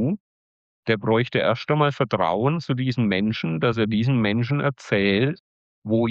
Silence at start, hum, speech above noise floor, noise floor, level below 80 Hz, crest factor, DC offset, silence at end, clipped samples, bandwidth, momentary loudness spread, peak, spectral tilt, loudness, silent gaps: 0 s; none; over 69 dB; under -90 dBFS; -58 dBFS; 14 dB; under 0.1%; 0 s; under 0.1%; 7.6 kHz; 5 LU; -8 dBFS; -7.5 dB/octave; -22 LUFS; 0.20-0.83 s, 5.40-5.82 s